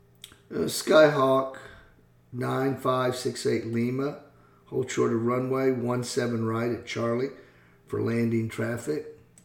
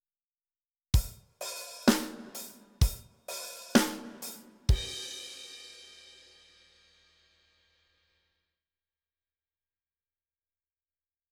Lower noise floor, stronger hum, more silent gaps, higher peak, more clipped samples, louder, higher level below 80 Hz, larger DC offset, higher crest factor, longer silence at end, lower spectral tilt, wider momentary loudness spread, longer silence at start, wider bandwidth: second, -57 dBFS vs under -90 dBFS; neither; neither; about the same, -6 dBFS vs -8 dBFS; neither; first, -27 LUFS vs -32 LUFS; second, -64 dBFS vs -40 dBFS; neither; second, 20 dB vs 28 dB; second, 0.3 s vs 5.4 s; about the same, -5.5 dB/octave vs -4.5 dB/octave; second, 13 LU vs 19 LU; second, 0.25 s vs 0.95 s; about the same, 18.5 kHz vs 20 kHz